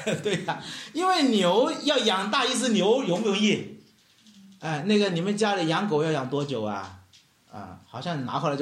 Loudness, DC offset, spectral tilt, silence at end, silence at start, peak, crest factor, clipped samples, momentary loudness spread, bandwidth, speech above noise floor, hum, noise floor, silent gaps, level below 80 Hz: -25 LUFS; under 0.1%; -4.5 dB/octave; 0 s; 0 s; -10 dBFS; 16 dB; under 0.1%; 14 LU; 13 kHz; 33 dB; none; -58 dBFS; none; -72 dBFS